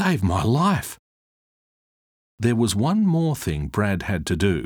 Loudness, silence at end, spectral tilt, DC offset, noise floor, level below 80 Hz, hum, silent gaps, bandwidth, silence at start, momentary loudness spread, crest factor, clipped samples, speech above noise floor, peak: -22 LUFS; 0 s; -6 dB/octave; under 0.1%; under -90 dBFS; -44 dBFS; none; 0.99-2.38 s; over 20 kHz; 0 s; 6 LU; 16 dB; under 0.1%; over 69 dB; -6 dBFS